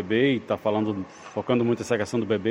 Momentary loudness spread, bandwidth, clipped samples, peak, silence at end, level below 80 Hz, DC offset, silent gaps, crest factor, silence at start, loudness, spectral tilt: 10 LU; 15.5 kHz; under 0.1%; -8 dBFS; 0 s; -62 dBFS; under 0.1%; none; 16 dB; 0 s; -25 LUFS; -6 dB/octave